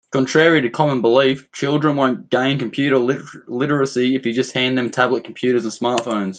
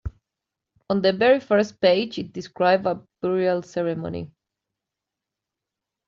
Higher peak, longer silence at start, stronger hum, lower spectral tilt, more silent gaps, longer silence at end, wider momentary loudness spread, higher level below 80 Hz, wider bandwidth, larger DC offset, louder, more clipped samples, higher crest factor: first, 0 dBFS vs -6 dBFS; about the same, 0.1 s vs 0.05 s; neither; first, -5.5 dB/octave vs -4 dB/octave; neither; second, 0 s vs 1.8 s; second, 6 LU vs 14 LU; second, -62 dBFS vs -52 dBFS; first, 9.6 kHz vs 7.2 kHz; neither; first, -18 LUFS vs -22 LUFS; neither; about the same, 18 dB vs 20 dB